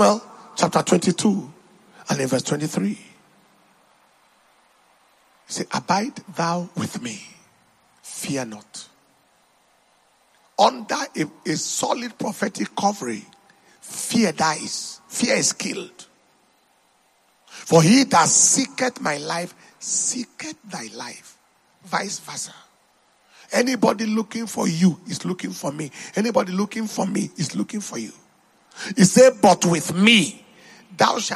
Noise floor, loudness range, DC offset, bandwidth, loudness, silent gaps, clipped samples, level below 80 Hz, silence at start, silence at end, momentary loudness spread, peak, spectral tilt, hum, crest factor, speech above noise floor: -61 dBFS; 12 LU; under 0.1%; 13 kHz; -21 LUFS; none; under 0.1%; -68 dBFS; 0 s; 0 s; 19 LU; 0 dBFS; -3.5 dB/octave; none; 22 dB; 40 dB